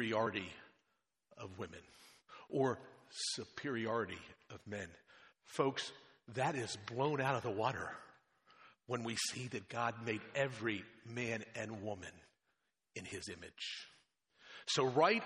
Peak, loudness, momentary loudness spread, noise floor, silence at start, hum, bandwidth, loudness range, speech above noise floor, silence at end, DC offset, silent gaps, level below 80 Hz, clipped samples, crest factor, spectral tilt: -18 dBFS; -40 LUFS; 17 LU; -85 dBFS; 0 s; none; 11.5 kHz; 5 LU; 45 dB; 0 s; under 0.1%; none; -80 dBFS; under 0.1%; 24 dB; -4 dB/octave